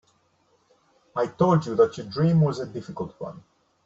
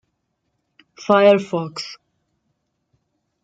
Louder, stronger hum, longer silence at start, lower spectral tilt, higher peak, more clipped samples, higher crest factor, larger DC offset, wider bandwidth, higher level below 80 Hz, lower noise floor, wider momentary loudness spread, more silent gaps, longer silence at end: second, -24 LUFS vs -17 LUFS; neither; first, 1.15 s vs 1 s; first, -8.5 dB/octave vs -6 dB/octave; second, -6 dBFS vs -2 dBFS; neither; about the same, 20 dB vs 20 dB; neither; about the same, 7.6 kHz vs 7.8 kHz; first, -62 dBFS vs -68 dBFS; second, -66 dBFS vs -73 dBFS; second, 14 LU vs 20 LU; neither; second, 0.45 s vs 1.5 s